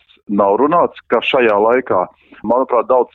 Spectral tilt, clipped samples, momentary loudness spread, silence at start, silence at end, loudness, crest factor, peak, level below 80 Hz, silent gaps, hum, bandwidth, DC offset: -7.5 dB/octave; under 0.1%; 7 LU; 0.3 s; 0.1 s; -14 LUFS; 12 dB; -2 dBFS; -56 dBFS; none; none; 4.3 kHz; under 0.1%